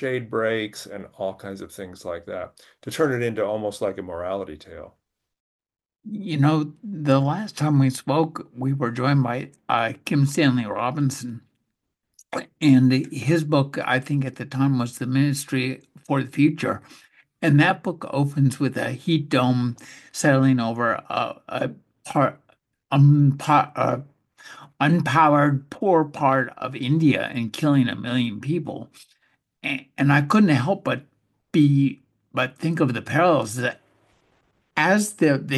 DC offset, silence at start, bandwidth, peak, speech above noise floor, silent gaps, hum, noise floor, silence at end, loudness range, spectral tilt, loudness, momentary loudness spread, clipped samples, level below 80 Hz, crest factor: under 0.1%; 0 s; 12.5 kHz; -4 dBFS; 57 dB; 5.40-5.59 s; none; -79 dBFS; 0 s; 7 LU; -6.5 dB/octave; -22 LUFS; 15 LU; under 0.1%; -64 dBFS; 18 dB